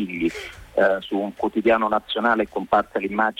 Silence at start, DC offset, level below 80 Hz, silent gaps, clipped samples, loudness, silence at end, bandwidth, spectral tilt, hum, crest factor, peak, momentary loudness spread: 0 s; under 0.1%; -52 dBFS; none; under 0.1%; -22 LUFS; 0.05 s; 15.5 kHz; -5.5 dB/octave; none; 14 dB; -8 dBFS; 7 LU